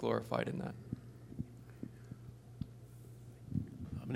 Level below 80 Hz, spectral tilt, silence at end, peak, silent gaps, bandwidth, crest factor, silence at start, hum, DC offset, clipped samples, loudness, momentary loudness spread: -62 dBFS; -7.5 dB/octave; 0 s; -18 dBFS; none; 16 kHz; 24 dB; 0 s; none; under 0.1%; under 0.1%; -44 LUFS; 17 LU